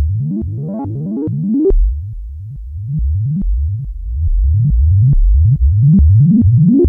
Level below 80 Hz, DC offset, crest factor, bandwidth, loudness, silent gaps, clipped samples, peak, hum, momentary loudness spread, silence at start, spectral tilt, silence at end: -16 dBFS; under 0.1%; 8 dB; 1.2 kHz; -14 LUFS; none; under 0.1%; -4 dBFS; none; 15 LU; 0 s; -15.5 dB/octave; 0 s